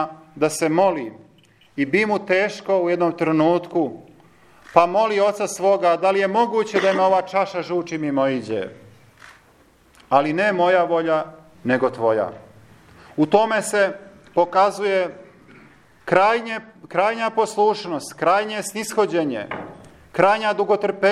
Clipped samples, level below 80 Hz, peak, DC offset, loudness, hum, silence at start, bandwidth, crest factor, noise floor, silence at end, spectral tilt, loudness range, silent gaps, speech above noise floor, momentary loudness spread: under 0.1%; -64 dBFS; 0 dBFS; under 0.1%; -20 LUFS; none; 0 s; 14 kHz; 20 dB; -54 dBFS; 0 s; -5 dB/octave; 3 LU; none; 35 dB; 12 LU